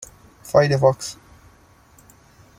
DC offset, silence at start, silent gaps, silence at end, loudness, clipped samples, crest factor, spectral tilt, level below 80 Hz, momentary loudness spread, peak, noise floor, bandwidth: under 0.1%; 0.45 s; none; 1.45 s; -19 LUFS; under 0.1%; 20 dB; -5.5 dB/octave; -52 dBFS; 25 LU; -2 dBFS; -52 dBFS; 16 kHz